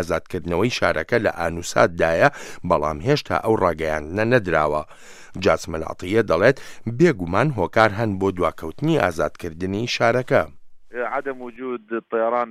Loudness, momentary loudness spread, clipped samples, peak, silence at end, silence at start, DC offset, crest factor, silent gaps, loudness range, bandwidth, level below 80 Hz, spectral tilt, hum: -21 LUFS; 11 LU; under 0.1%; 0 dBFS; 0 s; 0 s; under 0.1%; 20 dB; none; 3 LU; 15 kHz; -46 dBFS; -6 dB/octave; none